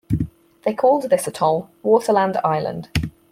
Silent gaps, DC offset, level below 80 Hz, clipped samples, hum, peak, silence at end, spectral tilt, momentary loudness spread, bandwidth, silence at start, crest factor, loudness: none; under 0.1%; -42 dBFS; under 0.1%; none; -2 dBFS; 0.2 s; -6 dB/octave; 9 LU; 16 kHz; 0.1 s; 18 dB; -20 LUFS